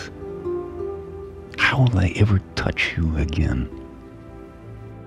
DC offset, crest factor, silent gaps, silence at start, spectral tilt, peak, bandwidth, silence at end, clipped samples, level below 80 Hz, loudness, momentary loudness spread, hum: under 0.1%; 20 dB; none; 0 s; -6.5 dB/octave; -4 dBFS; 10 kHz; 0 s; under 0.1%; -34 dBFS; -22 LUFS; 22 LU; none